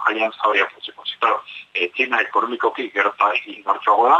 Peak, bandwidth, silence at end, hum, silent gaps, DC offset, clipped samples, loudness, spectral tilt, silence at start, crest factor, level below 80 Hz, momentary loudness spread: -2 dBFS; 7.8 kHz; 0 s; none; none; under 0.1%; under 0.1%; -20 LUFS; -3 dB/octave; 0 s; 18 dB; -76 dBFS; 7 LU